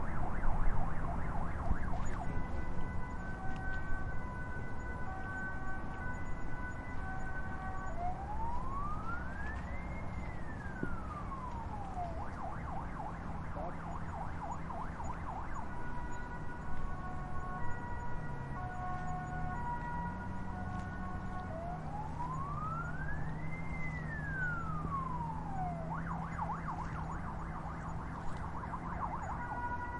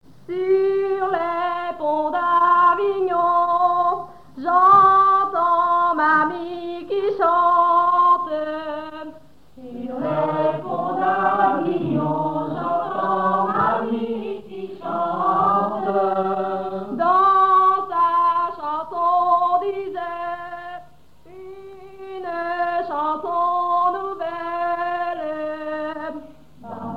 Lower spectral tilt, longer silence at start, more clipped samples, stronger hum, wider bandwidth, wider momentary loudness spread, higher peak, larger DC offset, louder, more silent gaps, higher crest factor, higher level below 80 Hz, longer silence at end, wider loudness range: about the same, -7.5 dB/octave vs -7.5 dB/octave; second, 0 s vs 0.3 s; neither; neither; first, 7.4 kHz vs 6.2 kHz; second, 4 LU vs 16 LU; second, -18 dBFS vs -4 dBFS; second, under 0.1% vs 0.5%; second, -42 LUFS vs -20 LUFS; neither; about the same, 18 dB vs 16 dB; first, -42 dBFS vs -60 dBFS; about the same, 0 s vs 0 s; second, 3 LU vs 8 LU